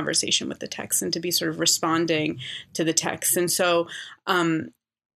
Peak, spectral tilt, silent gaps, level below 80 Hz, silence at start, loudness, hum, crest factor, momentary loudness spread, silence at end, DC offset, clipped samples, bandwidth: -6 dBFS; -2.5 dB/octave; none; -70 dBFS; 0 s; -23 LUFS; none; 20 dB; 12 LU; 0.45 s; under 0.1%; under 0.1%; 14 kHz